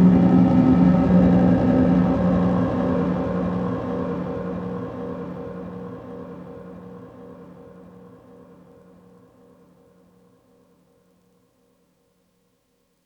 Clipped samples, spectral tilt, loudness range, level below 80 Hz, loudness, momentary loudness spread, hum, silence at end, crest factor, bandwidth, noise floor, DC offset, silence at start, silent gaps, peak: under 0.1%; -10.5 dB/octave; 24 LU; -42 dBFS; -20 LUFS; 24 LU; none; 5.35 s; 18 dB; 5.4 kHz; -67 dBFS; under 0.1%; 0 s; none; -4 dBFS